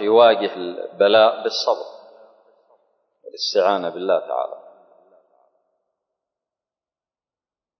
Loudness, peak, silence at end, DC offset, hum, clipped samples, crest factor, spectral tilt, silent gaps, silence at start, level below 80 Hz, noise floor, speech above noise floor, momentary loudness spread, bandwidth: -19 LUFS; -2 dBFS; 3.2 s; under 0.1%; none; under 0.1%; 20 dB; -3.5 dB/octave; none; 0 s; -76 dBFS; under -90 dBFS; over 72 dB; 16 LU; 6.4 kHz